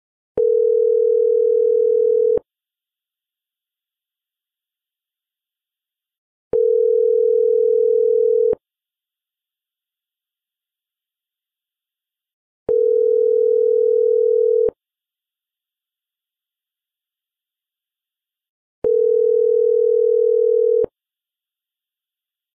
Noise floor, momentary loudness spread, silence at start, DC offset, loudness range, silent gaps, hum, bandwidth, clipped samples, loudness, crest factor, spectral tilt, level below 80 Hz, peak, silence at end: -89 dBFS; 5 LU; 0.35 s; under 0.1%; 9 LU; 6.18-6.51 s, 12.33-12.66 s, 18.49-18.82 s; none; 1.3 kHz; under 0.1%; -17 LUFS; 10 dB; -10.5 dB/octave; -62 dBFS; -8 dBFS; 1.7 s